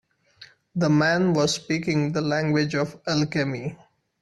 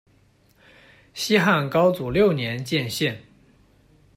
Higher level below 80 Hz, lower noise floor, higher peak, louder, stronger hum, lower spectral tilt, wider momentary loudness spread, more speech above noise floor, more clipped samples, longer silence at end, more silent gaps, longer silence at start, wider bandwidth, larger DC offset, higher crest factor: second, -60 dBFS vs -54 dBFS; second, -51 dBFS vs -59 dBFS; about the same, -8 dBFS vs -6 dBFS; about the same, -23 LUFS vs -22 LUFS; neither; about the same, -5.5 dB/octave vs -5 dB/octave; about the same, 8 LU vs 10 LU; second, 29 dB vs 38 dB; neither; second, 0.45 s vs 0.95 s; neither; second, 0.4 s vs 1.15 s; second, 12 kHz vs 16 kHz; neither; about the same, 16 dB vs 18 dB